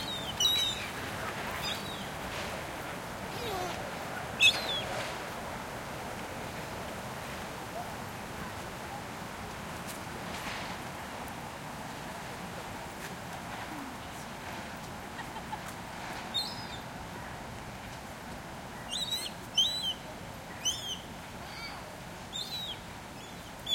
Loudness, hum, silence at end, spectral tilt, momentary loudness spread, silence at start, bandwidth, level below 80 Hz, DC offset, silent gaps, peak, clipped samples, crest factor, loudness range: -35 LUFS; none; 0 s; -2.5 dB/octave; 14 LU; 0 s; 16.5 kHz; -56 dBFS; under 0.1%; none; -12 dBFS; under 0.1%; 26 dB; 9 LU